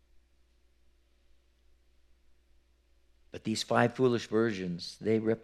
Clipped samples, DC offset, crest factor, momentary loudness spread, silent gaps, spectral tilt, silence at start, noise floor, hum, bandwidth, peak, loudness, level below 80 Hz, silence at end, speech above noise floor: under 0.1%; under 0.1%; 26 dB; 11 LU; none; -5.5 dB/octave; 3.35 s; -67 dBFS; none; 13 kHz; -8 dBFS; -30 LUFS; -68 dBFS; 0.05 s; 37 dB